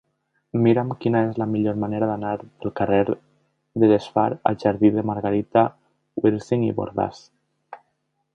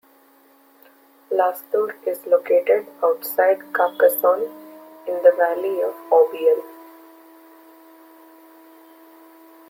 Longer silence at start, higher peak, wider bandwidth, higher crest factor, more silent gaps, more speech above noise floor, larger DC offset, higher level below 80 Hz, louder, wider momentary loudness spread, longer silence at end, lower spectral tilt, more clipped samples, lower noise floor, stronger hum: second, 0.55 s vs 1.3 s; about the same, -2 dBFS vs -2 dBFS; second, 7.6 kHz vs 16.5 kHz; about the same, 20 dB vs 20 dB; neither; first, 52 dB vs 35 dB; neither; first, -56 dBFS vs -78 dBFS; about the same, -22 LUFS vs -20 LUFS; about the same, 10 LU vs 10 LU; second, 0.6 s vs 2.85 s; first, -9 dB/octave vs -3 dB/octave; neither; first, -73 dBFS vs -54 dBFS; neither